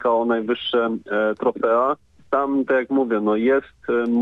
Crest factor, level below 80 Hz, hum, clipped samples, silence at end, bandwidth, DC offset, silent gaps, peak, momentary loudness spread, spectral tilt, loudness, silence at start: 12 dB; -60 dBFS; none; under 0.1%; 0 s; 5.2 kHz; under 0.1%; none; -8 dBFS; 4 LU; -7.5 dB/octave; -21 LUFS; 0 s